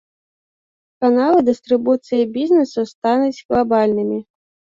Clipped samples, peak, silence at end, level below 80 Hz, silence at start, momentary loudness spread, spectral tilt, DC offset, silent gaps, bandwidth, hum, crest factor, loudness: under 0.1%; -4 dBFS; 0.55 s; -54 dBFS; 1 s; 7 LU; -6.5 dB/octave; under 0.1%; 2.95-3.02 s, 3.45-3.49 s; 7.6 kHz; none; 14 dB; -17 LUFS